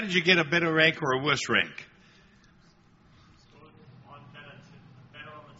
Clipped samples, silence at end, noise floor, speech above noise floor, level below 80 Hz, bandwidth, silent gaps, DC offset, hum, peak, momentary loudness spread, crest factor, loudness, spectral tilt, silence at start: under 0.1%; 0.2 s; -59 dBFS; 34 dB; -66 dBFS; 8 kHz; none; under 0.1%; none; -4 dBFS; 26 LU; 24 dB; -24 LUFS; -2 dB/octave; 0 s